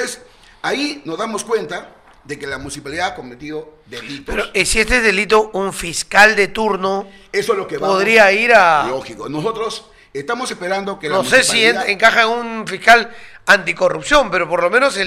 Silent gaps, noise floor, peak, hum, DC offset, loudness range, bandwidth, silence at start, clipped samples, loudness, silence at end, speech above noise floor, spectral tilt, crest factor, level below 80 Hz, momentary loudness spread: none; -42 dBFS; 0 dBFS; none; under 0.1%; 10 LU; 16.5 kHz; 0 s; under 0.1%; -15 LUFS; 0 s; 26 dB; -2.5 dB/octave; 16 dB; -38 dBFS; 19 LU